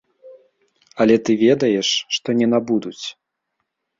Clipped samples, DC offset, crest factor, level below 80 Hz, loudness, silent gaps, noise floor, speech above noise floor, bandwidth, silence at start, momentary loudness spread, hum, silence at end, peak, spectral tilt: under 0.1%; under 0.1%; 18 dB; -62 dBFS; -18 LUFS; none; -76 dBFS; 58 dB; 7.6 kHz; 0.25 s; 15 LU; none; 0.9 s; -2 dBFS; -4.5 dB/octave